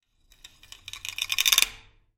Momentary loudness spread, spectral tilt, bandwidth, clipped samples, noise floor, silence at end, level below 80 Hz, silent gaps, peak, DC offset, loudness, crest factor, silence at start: 21 LU; 3 dB/octave; 17 kHz; under 0.1%; -55 dBFS; 0.4 s; -56 dBFS; none; 0 dBFS; under 0.1%; -23 LUFS; 30 dB; 0.95 s